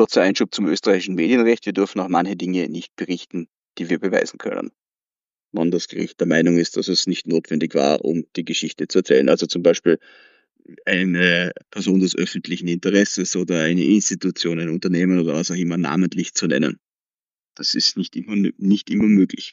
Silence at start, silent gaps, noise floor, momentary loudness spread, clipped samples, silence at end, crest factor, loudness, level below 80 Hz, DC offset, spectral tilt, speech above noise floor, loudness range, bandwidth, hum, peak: 0 s; 17.01-17.05 s, 17.14-17.19 s; under -90 dBFS; 10 LU; under 0.1%; 0 s; 18 dB; -20 LUFS; -66 dBFS; under 0.1%; -4.5 dB/octave; over 71 dB; 4 LU; 8 kHz; none; -2 dBFS